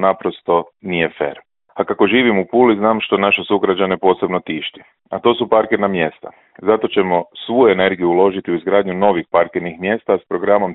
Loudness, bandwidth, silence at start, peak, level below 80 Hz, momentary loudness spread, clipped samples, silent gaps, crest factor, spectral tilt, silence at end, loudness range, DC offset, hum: -16 LUFS; 4.1 kHz; 0 s; 0 dBFS; -56 dBFS; 9 LU; under 0.1%; none; 16 dB; -10.5 dB/octave; 0 s; 3 LU; under 0.1%; none